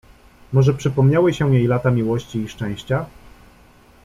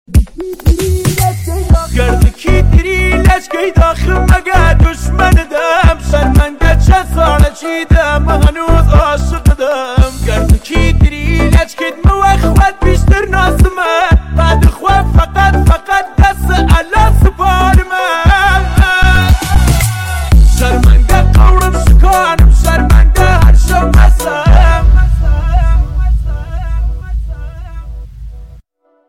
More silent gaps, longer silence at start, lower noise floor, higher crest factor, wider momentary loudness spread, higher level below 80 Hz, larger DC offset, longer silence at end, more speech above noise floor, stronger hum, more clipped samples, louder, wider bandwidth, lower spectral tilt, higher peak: neither; first, 0.5 s vs 0.1 s; first, -49 dBFS vs -45 dBFS; first, 16 dB vs 8 dB; first, 11 LU vs 6 LU; second, -46 dBFS vs -10 dBFS; second, under 0.1% vs 0.5%; first, 0.95 s vs 0.6 s; second, 32 dB vs 37 dB; neither; neither; second, -19 LUFS vs -10 LUFS; second, 7.6 kHz vs 15.5 kHz; first, -8 dB/octave vs -6 dB/octave; second, -4 dBFS vs 0 dBFS